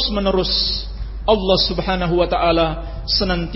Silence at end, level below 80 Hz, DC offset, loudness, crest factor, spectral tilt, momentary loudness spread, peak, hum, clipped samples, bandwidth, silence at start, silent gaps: 0 s; -28 dBFS; under 0.1%; -18 LUFS; 18 dB; -7.5 dB/octave; 8 LU; -2 dBFS; none; under 0.1%; 6 kHz; 0 s; none